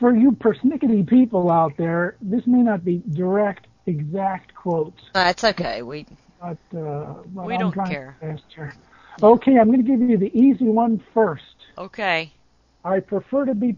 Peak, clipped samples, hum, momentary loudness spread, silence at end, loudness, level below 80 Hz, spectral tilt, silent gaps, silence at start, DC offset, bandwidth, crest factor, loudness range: 0 dBFS; under 0.1%; none; 19 LU; 0 s; -20 LUFS; -56 dBFS; -7.5 dB/octave; none; 0 s; under 0.1%; 7.4 kHz; 20 dB; 7 LU